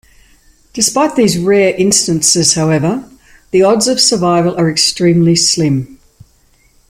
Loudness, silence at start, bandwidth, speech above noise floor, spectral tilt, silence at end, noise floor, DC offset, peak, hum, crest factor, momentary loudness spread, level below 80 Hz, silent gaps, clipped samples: -11 LUFS; 0.75 s; 16 kHz; 40 dB; -4 dB/octave; 0.95 s; -51 dBFS; under 0.1%; 0 dBFS; none; 12 dB; 7 LU; -46 dBFS; none; under 0.1%